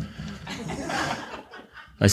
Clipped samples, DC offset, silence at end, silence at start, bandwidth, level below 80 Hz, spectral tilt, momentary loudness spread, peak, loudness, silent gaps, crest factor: under 0.1%; under 0.1%; 0 s; 0 s; 14.5 kHz; -50 dBFS; -4.5 dB/octave; 17 LU; -4 dBFS; -31 LUFS; none; 24 dB